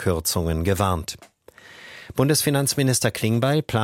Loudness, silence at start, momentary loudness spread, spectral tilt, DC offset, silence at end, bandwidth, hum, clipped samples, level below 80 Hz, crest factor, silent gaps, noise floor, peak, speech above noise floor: -22 LUFS; 0 s; 15 LU; -4.5 dB/octave; under 0.1%; 0 s; 17 kHz; none; under 0.1%; -42 dBFS; 18 dB; none; -47 dBFS; -6 dBFS; 26 dB